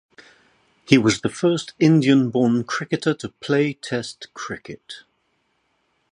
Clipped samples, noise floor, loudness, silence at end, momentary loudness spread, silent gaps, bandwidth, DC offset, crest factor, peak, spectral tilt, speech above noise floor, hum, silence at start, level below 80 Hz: under 0.1%; -69 dBFS; -20 LUFS; 1.1 s; 18 LU; none; 10.5 kHz; under 0.1%; 22 dB; 0 dBFS; -5.5 dB/octave; 49 dB; none; 0.9 s; -58 dBFS